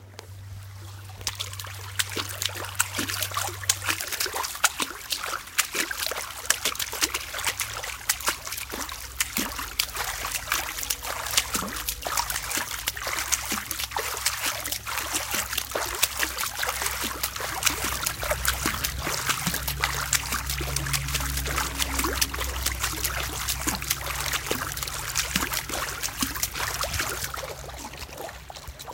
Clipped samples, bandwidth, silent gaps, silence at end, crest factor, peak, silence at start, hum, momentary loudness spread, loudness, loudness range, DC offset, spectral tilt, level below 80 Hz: under 0.1%; 17 kHz; none; 0 s; 30 dB; 0 dBFS; 0 s; none; 8 LU; -27 LUFS; 2 LU; under 0.1%; -1.5 dB/octave; -42 dBFS